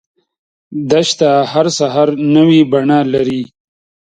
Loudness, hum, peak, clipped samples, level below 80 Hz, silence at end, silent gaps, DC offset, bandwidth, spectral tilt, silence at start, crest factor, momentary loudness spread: -12 LUFS; none; 0 dBFS; under 0.1%; -56 dBFS; 0.7 s; none; under 0.1%; 9.4 kHz; -5.5 dB/octave; 0.7 s; 12 dB; 13 LU